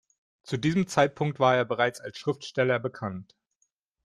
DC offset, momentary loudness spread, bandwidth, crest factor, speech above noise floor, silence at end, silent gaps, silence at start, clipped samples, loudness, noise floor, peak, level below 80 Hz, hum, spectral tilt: under 0.1%; 12 LU; 13 kHz; 20 dB; 49 dB; 0.8 s; none; 0.45 s; under 0.1%; -27 LUFS; -75 dBFS; -8 dBFS; -66 dBFS; none; -5.5 dB/octave